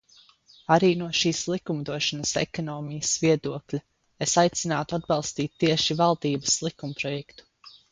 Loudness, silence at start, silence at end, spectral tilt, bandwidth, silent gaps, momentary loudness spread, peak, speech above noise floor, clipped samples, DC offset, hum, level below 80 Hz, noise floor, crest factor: -25 LUFS; 0.7 s; 0.2 s; -4 dB/octave; 10 kHz; none; 11 LU; -6 dBFS; 31 dB; under 0.1%; under 0.1%; none; -60 dBFS; -57 dBFS; 20 dB